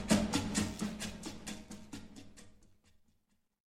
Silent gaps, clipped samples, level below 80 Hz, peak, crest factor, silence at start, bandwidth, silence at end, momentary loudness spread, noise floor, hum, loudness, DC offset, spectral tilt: none; under 0.1%; -56 dBFS; -14 dBFS; 24 dB; 0 s; 15.5 kHz; 1 s; 22 LU; -76 dBFS; none; -37 LUFS; under 0.1%; -4 dB/octave